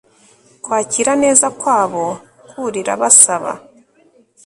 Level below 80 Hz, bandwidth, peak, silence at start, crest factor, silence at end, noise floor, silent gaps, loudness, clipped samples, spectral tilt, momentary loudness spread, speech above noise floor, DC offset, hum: -60 dBFS; 16 kHz; 0 dBFS; 0.65 s; 16 dB; 0.85 s; -52 dBFS; none; -13 LUFS; 0.2%; -2 dB/octave; 19 LU; 38 dB; under 0.1%; none